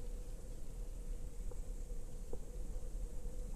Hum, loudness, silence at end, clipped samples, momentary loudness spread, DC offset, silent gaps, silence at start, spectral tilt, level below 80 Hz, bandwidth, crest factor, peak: none; -51 LUFS; 0 s; under 0.1%; 2 LU; under 0.1%; none; 0 s; -6 dB/octave; -44 dBFS; 14 kHz; 12 dB; -30 dBFS